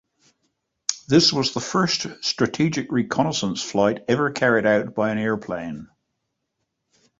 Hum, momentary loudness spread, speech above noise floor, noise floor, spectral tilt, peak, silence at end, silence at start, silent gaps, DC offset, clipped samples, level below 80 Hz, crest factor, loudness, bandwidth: none; 10 LU; 56 dB; -77 dBFS; -4 dB/octave; -2 dBFS; 1.35 s; 0.9 s; none; under 0.1%; under 0.1%; -58 dBFS; 20 dB; -21 LUFS; 8 kHz